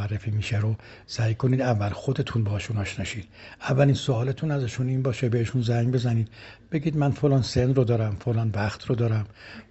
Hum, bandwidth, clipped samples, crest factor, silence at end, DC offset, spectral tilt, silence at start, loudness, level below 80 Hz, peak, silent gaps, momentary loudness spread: none; 8.2 kHz; under 0.1%; 18 dB; 0.1 s; under 0.1%; -7 dB/octave; 0 s; -25 LUFS; -50 dBFS; -6 dBFS; none; 11 LU